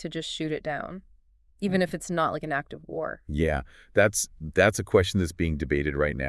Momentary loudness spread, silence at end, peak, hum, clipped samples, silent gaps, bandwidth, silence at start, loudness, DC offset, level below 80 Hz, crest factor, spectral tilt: 11 LU; 0 s; -6 dBFS; none; under 0.1%; none; 12 kHz; 0 s; -27 LUFS; under 0.1%; -44 dBFS; 22 dB; -5 dB/octave